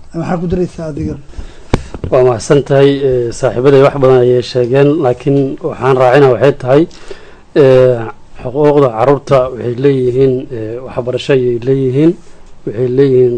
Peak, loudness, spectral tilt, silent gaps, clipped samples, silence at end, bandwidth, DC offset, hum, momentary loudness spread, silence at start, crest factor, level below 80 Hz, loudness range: 0 dBFS; -11 LUFS; -7.5 dB/octave; none; 2%; 0 s; 9.4 kHz; 0.3%; none; 13 LU; 0 s; 10 dB; -34 dBFS; 3 LU